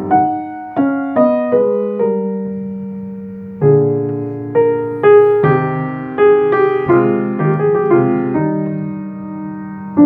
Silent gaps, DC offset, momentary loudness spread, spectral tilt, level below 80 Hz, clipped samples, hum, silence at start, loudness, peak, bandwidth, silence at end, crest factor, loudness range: none; under 0.1%; 15 LU; -11.5 dB/octave; -56 dBFS; under 0.1%; none; 0 s; -14 LUFS; 0 dBFS; 3.6 kHz; 0 s; 14 dB; 4 LU